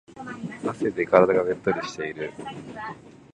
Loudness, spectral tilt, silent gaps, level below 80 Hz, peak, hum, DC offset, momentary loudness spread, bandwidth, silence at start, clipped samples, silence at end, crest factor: -24 LUFS; -6 dB/octave; none; -60 dBFS; 0 dBFS; none; under 0.1%; 19 LU; 9.8 kHz; 0.1 s; under 0.1%; 0.15 s; 24 dB